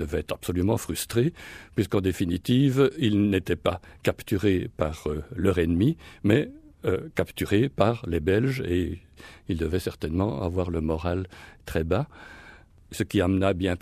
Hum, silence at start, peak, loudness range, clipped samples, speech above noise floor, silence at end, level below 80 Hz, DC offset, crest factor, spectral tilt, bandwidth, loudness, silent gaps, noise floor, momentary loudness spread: none; 0 s; -6 dBFS; 4 LU; under 0.1%; 25 dB; 0.05 s; -44 dBFS; under 0.1%; 20 dB; -6.5 dB/octave; 15.5 kHz; -26 LUFS; none; -50 dBFS; 10 LU